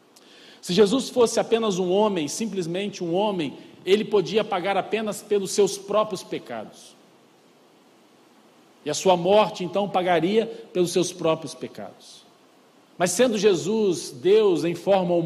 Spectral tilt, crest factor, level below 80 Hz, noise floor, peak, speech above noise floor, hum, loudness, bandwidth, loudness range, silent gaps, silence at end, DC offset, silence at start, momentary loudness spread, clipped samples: -4.5 dB/octave; 18 dB; -70 dBFS; -56 dBFS; -6 dBFS; 33 dB; none; -23 LUFS; 14.5 kHz; 5 LU; none; 0 s; under 0.1%; 0.65 s; 13 LU; under 0.1%